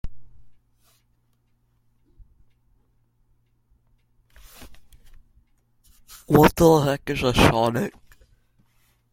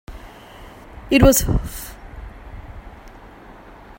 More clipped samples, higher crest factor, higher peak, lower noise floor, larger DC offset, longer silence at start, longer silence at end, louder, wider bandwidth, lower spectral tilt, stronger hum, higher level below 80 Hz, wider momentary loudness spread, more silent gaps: neither; about the same, 26 dB vs 22 dB; about the same, 0 dBFS vs 0 dBFS; first, -66 dBFS vs -42 dBFS; neither; about the same, 0.05 s vs 0.1 s; first, 1.25 s vs 0.9 s; about the same, -19 LUFS vs -17 LUFS; about the same, 16.5 kHz vs 16.5 kHz; about the same, -6 dB/octave vs -5 dB/octave; neither; second, -42 dBFS vs -30 dBFS; second, 14 LU vs 28 LU; neither